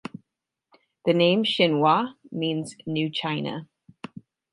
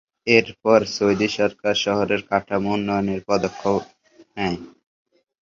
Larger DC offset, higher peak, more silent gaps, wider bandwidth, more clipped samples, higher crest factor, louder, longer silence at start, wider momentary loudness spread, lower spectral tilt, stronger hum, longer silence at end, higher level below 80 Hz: neither; second, -6 dBFS vs -2 dBFS; neither; first, 11.5 kHz vs 7.6 kHz; neither; about the same, 20 dB vs 20 dB; second, -24 LUFS vs -21 LUFS; first, 1.05 s vs 0.25 s; first, 22 LU vs 9 LU; about the same, -6 dB/octave vs -5 dB/octave; neither; about the same, 0.9 s vs 0.8 s; second, -72 dBFS vs -54 dBFS